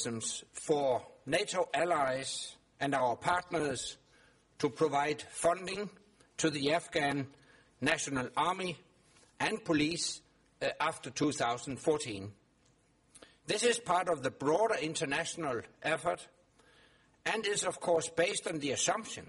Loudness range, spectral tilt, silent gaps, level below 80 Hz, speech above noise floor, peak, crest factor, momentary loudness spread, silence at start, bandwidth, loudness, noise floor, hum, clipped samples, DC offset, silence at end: 2 LU; -3 dB/octave; none; -68 dBFS; 36 dB; -12 dBFS; 22 dB; 9 LU; 0 s; 11.5 kHz; -33 LUFS; -69 dBFS; none; under 0.1%; under 0.1%; 0 s